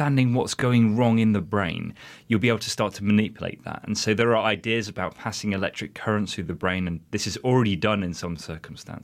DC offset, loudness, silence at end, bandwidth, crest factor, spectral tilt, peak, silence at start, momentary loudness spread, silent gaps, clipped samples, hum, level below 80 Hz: under 0.1%; -24 LUFS; 0.05 s; 15 kHz; 18 dB; -5.5 dB/octave; -6 dBFS; 0 s; 13 LU; none; under 0.1%; none; -54 dBFS